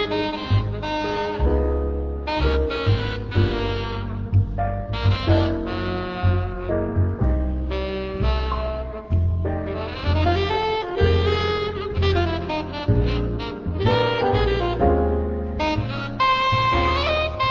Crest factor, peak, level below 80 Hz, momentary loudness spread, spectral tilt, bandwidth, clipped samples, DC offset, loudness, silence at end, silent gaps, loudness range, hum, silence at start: 16 dB; -4 dBFS; -28 dBFS; 7 LU; -7.5 dB/octave; 6.8 kHz; under 0.1%; under 0.1%; -23 LUFS; 0 s; none; 3 LU; none; 0 s